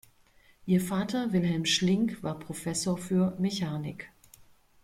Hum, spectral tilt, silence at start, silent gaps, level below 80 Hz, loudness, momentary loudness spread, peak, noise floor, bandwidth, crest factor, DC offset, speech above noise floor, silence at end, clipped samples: none; -5 dB/octave; 0.65 s; none; -60 dBFS; -29 LUFS; 12 LU; -14 dBFS; -61 dBFS; 15.5 kHz; 16 dB; under 0.1%; 33 dB; 0.75 s; under 0.1%